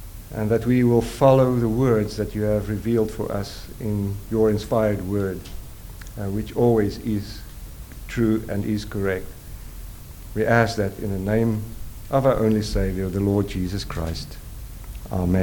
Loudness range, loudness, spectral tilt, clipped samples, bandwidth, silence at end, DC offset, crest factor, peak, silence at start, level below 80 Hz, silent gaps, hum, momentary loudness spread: 5 LU; -23 LUFS; -7 dB/octave; under 0.1%; 19 kHz; 0 s; under 0.1%; 20 dB; -2 dBFS; 0 s; -36 dBFS; none; none; 20 LU